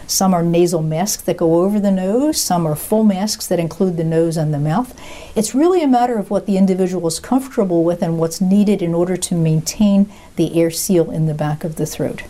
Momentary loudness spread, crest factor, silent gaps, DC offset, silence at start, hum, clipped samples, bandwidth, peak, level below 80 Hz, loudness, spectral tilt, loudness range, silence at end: 7 LU; 12 dB; none; 0.1%; 0 s; none; under 0.1%; 16 kHz; -4 dBFS; -44 dBFS; -17 LUFS; -6 dB/octave; 1 LU; 0 s